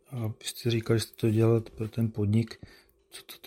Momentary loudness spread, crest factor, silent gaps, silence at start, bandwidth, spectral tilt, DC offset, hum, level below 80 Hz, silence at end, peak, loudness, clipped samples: 20 LU; 16 dB; none; 0.1 s; 16 kHz; -6.5 dB/octave; under 0.1%; none; -60 dBFS; 0.1 s; -12 dBFS; -29 LUFS; under 0.1%